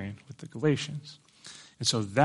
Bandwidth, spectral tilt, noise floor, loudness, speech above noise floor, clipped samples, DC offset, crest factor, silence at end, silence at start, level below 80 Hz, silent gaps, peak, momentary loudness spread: 11.5 kHz; -4.5 dB/octave; -51 dBFS; -30 LUFS; 23 dB; under 0.1%; under 0.1%; 22 dB; 0 s; 0 s; -68 dBFS; none; -8 dBFS; 20 LU